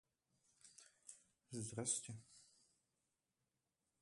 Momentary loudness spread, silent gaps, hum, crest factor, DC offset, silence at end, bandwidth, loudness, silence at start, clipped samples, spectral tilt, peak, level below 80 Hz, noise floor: 24 LU; none; none; 28 dB; under 0.1%; 1.55 s; 11.5 kHz; -46 LUFS; 0.65 s; under 0.1%; -3.5 dB/octave; -26 dBFS; -82 dBFS; under -90 dBFS